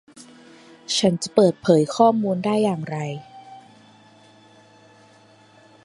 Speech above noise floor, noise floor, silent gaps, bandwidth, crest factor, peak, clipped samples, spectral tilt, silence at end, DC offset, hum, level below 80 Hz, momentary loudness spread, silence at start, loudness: 33 dB; -52 dBFS; none; 11.5 kHz; 22 dB; -2 dBFS; under 0.1%; -5.5 dB/octave; 2.25 s; under 0.1%; none; -64 dBFS; 16 LU; 0.15 s; -20 LUFS